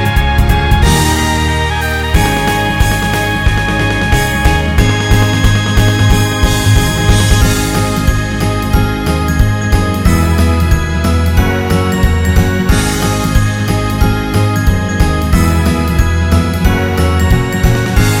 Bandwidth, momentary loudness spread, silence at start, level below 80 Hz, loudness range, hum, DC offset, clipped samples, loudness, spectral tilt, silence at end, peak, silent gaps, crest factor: 16.5 kHz; 3 LU; 0 s; -16 dBFS; 2 LU; none; under 0.1%; 0.3%; -12 LUFS; -5 dB/octave; 0 s; 0 dBFS; none; 10 dB